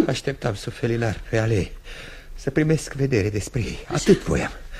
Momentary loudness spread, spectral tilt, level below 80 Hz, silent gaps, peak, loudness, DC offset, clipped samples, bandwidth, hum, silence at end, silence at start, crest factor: 13 LU; -6 dB/octave; -38 dBFS; none; -4 dBFS; -23 LUFS; under 0.1%; under 0.1%; 14.5 kHz; none; 0 s; 0 s; 20 dB